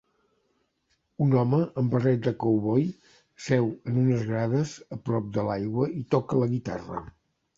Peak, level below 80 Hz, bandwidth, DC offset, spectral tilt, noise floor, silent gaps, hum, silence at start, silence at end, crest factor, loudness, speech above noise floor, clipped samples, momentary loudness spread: -8 dBFS; -60 dBFS; 7.8 kHz; under 0.1%; -8.5 dB/octave; -73 dBFS; none; none; 1.2 s; 0.45 s; 18 dB; -26 LUFS; 48 dB; under 0.1%; 10 LU